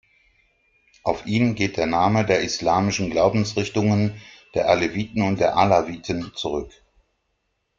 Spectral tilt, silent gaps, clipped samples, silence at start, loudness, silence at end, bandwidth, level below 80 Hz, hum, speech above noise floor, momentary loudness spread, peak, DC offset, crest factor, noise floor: -5.5 dB/octave; none; under 0.1%; 1.05 s; -22 LUFS; 1.1 s; 7.6 kHz; -50 dBFS; none; 52 dB; 9 LU; -2 dBFS; under 0.1%; 20 dB; -73 dBFS